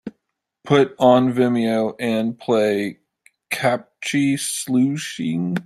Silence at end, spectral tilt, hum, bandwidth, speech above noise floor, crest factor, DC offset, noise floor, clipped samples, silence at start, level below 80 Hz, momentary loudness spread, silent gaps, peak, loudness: 0.05 s; -5 dB/octave; none; 14 kHz; 57 dB; 18 dB; under 0.1%; -76 dBFS; under 0.1%; 0.05 s; -64 dBFS; 10 LU; none; -2 dBFS; -20 LUFS